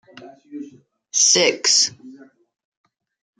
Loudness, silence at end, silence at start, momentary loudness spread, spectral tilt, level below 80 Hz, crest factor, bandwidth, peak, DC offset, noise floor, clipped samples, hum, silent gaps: -15 LUFS; 1.25 s; 0.2 s; 23 LU; 0 dB/octave; -76 dBFS; 22 dB; 11.5 kHz; -2 dBFS; under 0.1%; -47 dBFS; under 0.1%; none; none